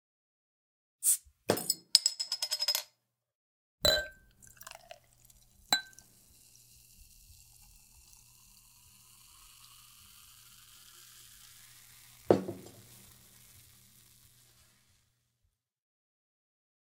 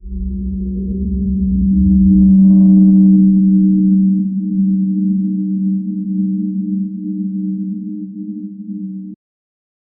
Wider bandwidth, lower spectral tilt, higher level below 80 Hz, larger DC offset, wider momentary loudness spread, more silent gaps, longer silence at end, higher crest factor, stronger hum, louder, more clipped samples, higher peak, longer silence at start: first, 17.5 kHz vs 0.7 kHz; second, -1.5 dB/octave vs -18.5 dB/octave; second, -64 dBFS vs -28 dBFS; neither; first, 27 LU vs 18 LU; first, 3.35-3.78 s vs none; first, 4.15 s vs 0.85 s; first, 38 dB vs 12 dB; neither; second, -30 LUFS vs -13 LUFS; neither; about the same, 0 dBFS vs -2 dBFS; first, 1 s vs 0.05 s